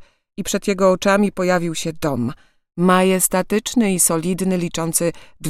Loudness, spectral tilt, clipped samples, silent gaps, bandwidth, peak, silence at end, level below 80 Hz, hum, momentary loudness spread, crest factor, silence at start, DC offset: -18 LUFS; -4.5 dB/octave; under 0.1%; none; 16 kHz; 0 dBFS; 0 s; -48 dBFS; none; 9 LU; 18 dB; 0 s; under 0.1%